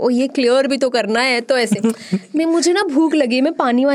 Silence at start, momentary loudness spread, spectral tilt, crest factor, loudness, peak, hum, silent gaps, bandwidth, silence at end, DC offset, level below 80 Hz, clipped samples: 0 s; 4 LU; -4 dB/octave; 14 dB; -16 LUFS; -2 dBFS; none; none; 13.5 kHz; 0 s; under 0.1%; -66 dBFS; under 0.1%